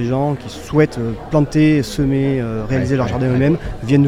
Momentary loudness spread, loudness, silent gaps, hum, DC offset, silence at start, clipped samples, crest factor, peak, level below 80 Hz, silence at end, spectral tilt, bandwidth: 7 LU; -17 LUFS; none; none; under 0.1%; 0 s; under 0.1%; 14 dB; -2 dBFS; -34 dBFS; 0 s; -7.5 dB/octave; 15 kHz